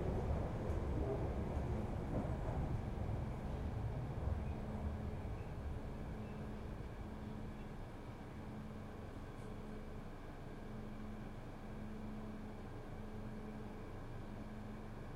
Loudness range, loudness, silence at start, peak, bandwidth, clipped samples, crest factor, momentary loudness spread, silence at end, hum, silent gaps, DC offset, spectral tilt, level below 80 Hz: 8 LU; -46 LUFS; 0 s; -26 dBFS; 13.5 kHz; under 0.1%; 18 dB; 9 LU; 0 s; none; none; under 0.1%; -8 dB/octave; -48 dBFS